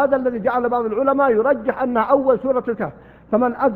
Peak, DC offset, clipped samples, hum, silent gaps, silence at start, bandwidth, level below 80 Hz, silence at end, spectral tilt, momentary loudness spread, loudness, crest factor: -2 dBFS; under 0.1%; under 0.1%; none; none; 0 s; 4.3 kHz; -52 dBFS; 0 s; -10 dB/octave; 6 LU; -19 LUFS; 16 dB